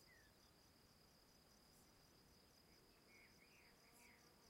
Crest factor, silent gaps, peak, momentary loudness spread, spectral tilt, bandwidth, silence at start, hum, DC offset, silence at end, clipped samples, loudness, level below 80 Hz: 14 dB; none; -56 dBFS; 2 LU; -3 dB/octave; 16 kHz; 0 s; none; under 0.1%; 0 s; under 0.1%; -69 LUFS; -84 dBFS